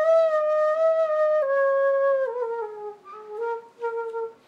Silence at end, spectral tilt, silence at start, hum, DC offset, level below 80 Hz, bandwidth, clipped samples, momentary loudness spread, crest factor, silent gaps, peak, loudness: 0.15 s; -2.5 dB/octave; 0 s; none; under 0.1%; -86 dBFS; 7.2 kHz; under 0.1%; 14 LU; 12 dB; none; -12 dBFS; -23 LUFS